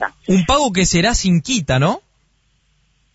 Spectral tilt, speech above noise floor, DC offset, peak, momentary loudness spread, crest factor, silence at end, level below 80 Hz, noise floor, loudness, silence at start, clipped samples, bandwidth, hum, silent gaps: -4.5 dB/octave; 45 dB; under 0.1%; -2 dBFS; 3 LU; 14 dB; 1.15 s; -32 dBFS; -61 dBFS; -16 LUFS; 0 s; under 0.1%; 8 kHz; none; none